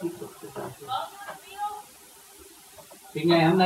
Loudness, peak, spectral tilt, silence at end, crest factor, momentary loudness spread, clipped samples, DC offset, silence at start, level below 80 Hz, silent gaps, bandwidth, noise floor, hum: -29 LUFS; -8 dBFS; -6 dB/octave; 0 s; 20 dB; 25 LU; under 0.1%; under 0.1%; 0 s; -68 dBFS; none; 16 kHz; -51 dBFS; none